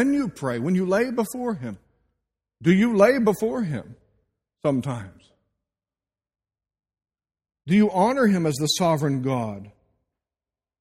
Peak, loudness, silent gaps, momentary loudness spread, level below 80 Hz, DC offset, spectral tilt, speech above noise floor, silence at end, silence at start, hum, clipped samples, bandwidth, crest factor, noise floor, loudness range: -4 dBFS; -22 LUFS; none; 15 LU; -60 dBFS; under 0.1%; -6 dB/octave; over 68 dB; 1.1 s; 0 s; none; under 0.1%; 16 kHz; 20 dB; under -90 dBFS; 11 LU